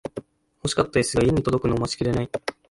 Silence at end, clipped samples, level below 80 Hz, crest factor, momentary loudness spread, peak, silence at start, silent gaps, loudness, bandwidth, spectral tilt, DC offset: 0.2 s; under 0.1%; -42 dBFS; 16 dB; 11 LU; -8 dBFS; 0.05 s; none; -23 LUFS; 11.5 kHz; -5.5 dB/octave; under 0.1%